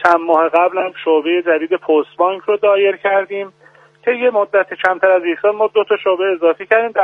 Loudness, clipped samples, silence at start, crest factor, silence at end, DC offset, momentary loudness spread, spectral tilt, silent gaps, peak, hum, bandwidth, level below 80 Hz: -15 LUFS; under 0.1%; 0 s; 14 dB; 0 s; under 0.1%; 5 LU; -5.5 dB/octave; none; 0 dBFS; none; 6.8 kHz; -66 dBFS